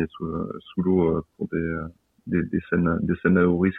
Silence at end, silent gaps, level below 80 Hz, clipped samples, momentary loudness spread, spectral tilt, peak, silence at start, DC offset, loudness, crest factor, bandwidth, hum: 0 s; none; -50 dBFS; under 0.1%; 11 LU; -11 dB/octave; -6 dBFS; 0 s; under 0.1%; -24 LUFS; 18 dB; 3.9 kHz; none